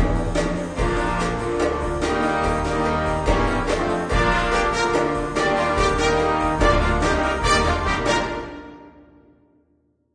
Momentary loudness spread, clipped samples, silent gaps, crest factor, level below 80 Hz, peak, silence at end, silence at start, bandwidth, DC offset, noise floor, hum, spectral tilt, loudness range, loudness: 5 LU; under 0.1%; none; 16 dB; -28 dBFS; -4 dBFS; 1.25 s; 0 s; 10 kHz; under 0.1%; -64 dBFS; none; -5 dB/octave; 3 LU; -21 LUFS